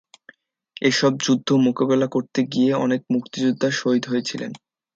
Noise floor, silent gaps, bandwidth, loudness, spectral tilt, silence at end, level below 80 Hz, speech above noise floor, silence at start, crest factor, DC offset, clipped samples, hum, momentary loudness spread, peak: -53 dBFS; none; 7.8 kHz; -21 LUFS; -5 dB/octave; 0.4 s; -68 dBFS; 32 dB; 0.8 s; 16 dB; under 0.1%; under 0.1%; none; 6 LU; -6 dBFS